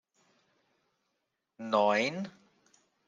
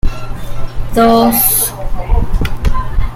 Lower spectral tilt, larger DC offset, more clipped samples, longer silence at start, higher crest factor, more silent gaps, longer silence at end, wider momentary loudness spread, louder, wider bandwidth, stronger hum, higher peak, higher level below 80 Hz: about the same, -4.5 dB/octave vs -4.5 dB/octave; neither; neither; first, 1.6 s vs 0.05 s; first, 22 dB vs 12 dB; neither; first, 0.75 s vs 0 s; about the same, 18 LU vs 18 LU; second, -29 LUFS vs -13 LUFS; second, 9.6 kHz vs 16.5 kHz; neither; second, -12 dBFS vs 0 dBFS; second, -86 dBFS vs -16 dBFS